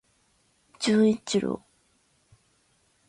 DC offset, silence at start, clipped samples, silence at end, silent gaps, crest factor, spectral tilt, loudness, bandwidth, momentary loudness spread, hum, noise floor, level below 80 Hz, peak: under 0.1%; 0.8 s; under 0.1%; 1.5 s; none; 18 dB; -5 dB/octave; -25 LUFS; 11 kHz; 11 LU; none; -67 dBFS; -66 dBFS; -12 dBFS